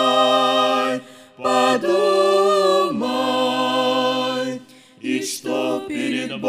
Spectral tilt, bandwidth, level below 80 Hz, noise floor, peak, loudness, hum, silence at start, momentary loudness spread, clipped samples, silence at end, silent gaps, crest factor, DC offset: -3.5 dB/octave; 15.5 kHz; -68 dBFS; -39 dBFS; -4 dBFS; -19 LUFS; none; 0 s; 10 LU; under 0.1%; 0 s; none; 16 dB; under 0.1%